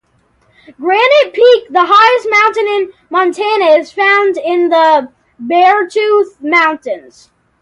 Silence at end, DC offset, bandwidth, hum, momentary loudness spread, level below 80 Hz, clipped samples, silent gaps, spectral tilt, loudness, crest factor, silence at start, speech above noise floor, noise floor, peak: 0.65 s; under 0.1%; 11 kHz; none; 8 LU; -62 dBFS; under 0.1%; none; -2.5 dB/octave; -10 LUFS; 12 dB; 0.8 s; 44 dB; -55 dBFS; 0 dBFS